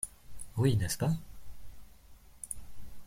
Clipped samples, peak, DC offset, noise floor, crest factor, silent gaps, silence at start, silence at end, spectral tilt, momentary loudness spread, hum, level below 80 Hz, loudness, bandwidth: under 0.1%; -14 dBFS; under 0.1%; -55 dBFS; 20 dB; none; 0 s; 0 s; -5.5 dB/octave; 26 LU; none; -52 dBFS; -34 LUFS; 16.5 kHz